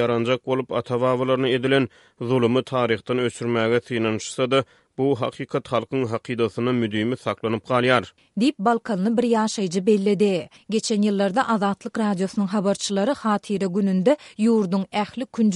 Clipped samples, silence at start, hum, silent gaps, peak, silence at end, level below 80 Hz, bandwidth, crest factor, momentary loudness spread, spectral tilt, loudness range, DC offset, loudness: under 0.1%; 0 s; none; none; -4 dBFS; 0 s; -64 dBFS; 11.5 kHz; 18 dB; 6 LU; -5.5 dB/octave; 3 LU; under 0.1%; -22 LUFS